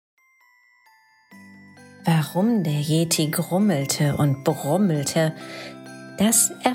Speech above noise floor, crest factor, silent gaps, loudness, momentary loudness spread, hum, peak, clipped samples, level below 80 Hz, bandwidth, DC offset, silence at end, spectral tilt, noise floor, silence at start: 38 dB; 18 dB; none; -21 LUFS; 18 LU; none; -4 dBFS; under 0.1%; -62 dBFS; 16.5 kHz; under 0.1%; 0 s; -4.5 dB/octave; -59 dBFS; 1.3 s